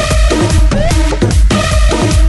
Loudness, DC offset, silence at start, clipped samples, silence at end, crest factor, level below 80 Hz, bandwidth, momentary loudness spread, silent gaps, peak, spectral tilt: -11 LUFS; under 0.1%; 0 s; under 0.1%; 0 s; 8 dB; -12 dBFS; 12 kHz; 1 LU; none; 0 dBFS; -5 dB/octave